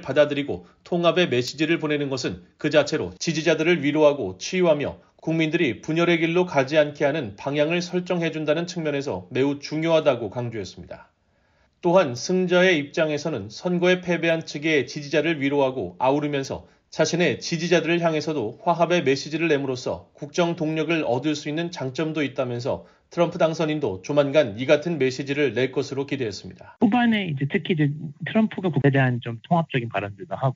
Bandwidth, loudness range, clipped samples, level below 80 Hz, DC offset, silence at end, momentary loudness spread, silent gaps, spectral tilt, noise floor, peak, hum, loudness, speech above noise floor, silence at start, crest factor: 7.6 kHz; 3 LU; under 0.1%; -62 dBFS; under 0.1%; 0 s; 10 LU; none; -4.5 dB/octave; -64 dBFS; -4 dBFS; none; -23 LUFS; 42 dB; 0 s; 18 dB